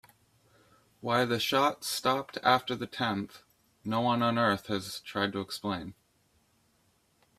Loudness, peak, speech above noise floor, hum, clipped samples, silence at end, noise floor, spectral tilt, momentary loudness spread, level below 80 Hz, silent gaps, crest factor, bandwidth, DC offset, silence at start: -30 LUFS; -8 dBFS; 40 dB; none; under 0.1%; 1.45 s; -70 dBFS; -4.5 dB/octave; 10 LU; -68 dBFS; none; 24 dB; 15.5 kHz; under 0.1%; 1.05 s